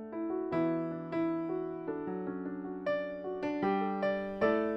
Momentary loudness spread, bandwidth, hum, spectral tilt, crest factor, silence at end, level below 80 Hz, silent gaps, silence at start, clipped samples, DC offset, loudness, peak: 7 LU; 6 kHz; none; -8.5 dB/octave; 16 dB; 0 s; -66 dBFS; none; 0 s; under 0.1%; under 0.1%; -35 LUFS; -18 dBFS